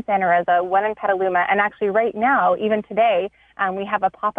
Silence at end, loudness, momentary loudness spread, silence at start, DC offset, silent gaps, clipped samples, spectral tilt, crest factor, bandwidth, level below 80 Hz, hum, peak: 0.05 s; -19 LUFS; 6 LU; 0.1 s; under 0.1%; none; under 0.1%; -7.5 dB/octave; 14 dB; 3.8 kHz; -60 dBFS; none; -6 dBFS